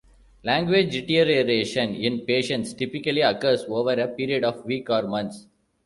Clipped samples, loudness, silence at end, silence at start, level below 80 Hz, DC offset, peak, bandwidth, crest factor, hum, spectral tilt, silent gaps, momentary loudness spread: under 0.1%; -23 LUFS; 0.45 s; 0.45 s; -58 dBFS; under 0.1%; -6 dBFS; 11.5 kHz; 18 dB; none; -5 dB/octave; none; 9 LU